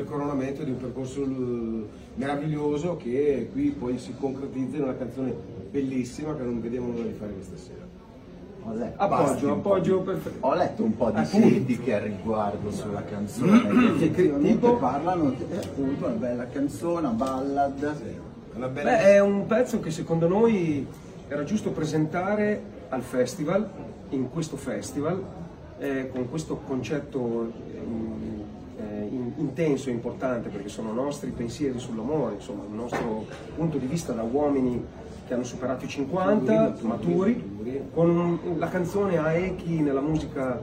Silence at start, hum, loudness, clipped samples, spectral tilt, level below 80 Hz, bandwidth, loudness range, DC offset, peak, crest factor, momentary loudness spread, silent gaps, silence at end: 0 s; none; -27 LUFS; under 0.1%; -7 dB/octave; -52 dBFS; 16 kHz; 8 LU; under 0.1%; -6 dBFS; 20 dB; 13 LU; none; 0 s